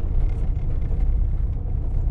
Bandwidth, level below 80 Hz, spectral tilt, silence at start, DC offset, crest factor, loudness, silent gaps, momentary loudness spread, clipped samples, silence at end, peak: 2.5 kHz; -22 dBFS; -10.5 dB/octave; 0 s; under 0.1%; 10 dB; -27 LUFS; none; 3 LU; under 0.1%; 0 s; -10 dBFS